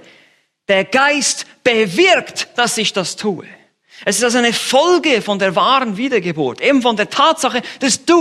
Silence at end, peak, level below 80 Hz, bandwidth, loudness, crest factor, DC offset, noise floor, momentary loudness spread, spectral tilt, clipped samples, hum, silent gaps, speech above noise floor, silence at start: 0 s; 0 dBFS; -62 dBFS; 14.5 kHz; -14 LUFS; 16 dB; under 0.1%; -54 dBFS; 8 LU; -2.5 dB/octave; under 0.1%; none; none; 39 dB; 0.7 s